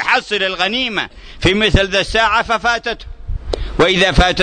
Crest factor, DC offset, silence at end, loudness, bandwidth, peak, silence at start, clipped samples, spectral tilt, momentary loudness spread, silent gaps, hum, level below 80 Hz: 16 dB; under 0.1%; 0 s; -15 LUFS; 9.6 kHz; 0 dBFS; 0 s; under 0.1%; -4.5 dB/octave; 13 LU; none; none; -26 dBFS